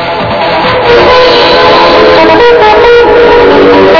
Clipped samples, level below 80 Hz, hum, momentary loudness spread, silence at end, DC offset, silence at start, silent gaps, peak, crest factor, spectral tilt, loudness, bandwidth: 30%; -26 dBFS; none; 5 LU; 0 s; under 0.1%; 0 s; none; 0 dBFS; 2 dB; -5.5 dB/octave; -3 LUFS; 5.4 kHz